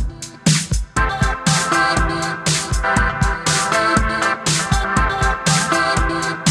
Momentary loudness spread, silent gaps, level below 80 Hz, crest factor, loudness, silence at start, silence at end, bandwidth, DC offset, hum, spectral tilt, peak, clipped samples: 4 LU; none; -26 dBFS; 16 dB; -17 LUFS; 0 s; 0 s; 14 kHz; under 0.1%; none; -3.5 dB/octave; -2 dBFS; under 0.1%